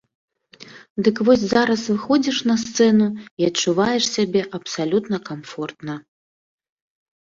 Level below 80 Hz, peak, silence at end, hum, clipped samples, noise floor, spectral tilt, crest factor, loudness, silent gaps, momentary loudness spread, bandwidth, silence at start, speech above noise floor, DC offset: -58 dBFS; -4 dBFS; 1.2 s; none; under 0.1%; -45 dBFS; -4.5 dB/octave; 18 dB; -20 LUFS; 0.90-0.96 s, 3.31-3.37 s; 14 LU; 7.6 kHz; 0.6 s; 25 dB; under 0.1%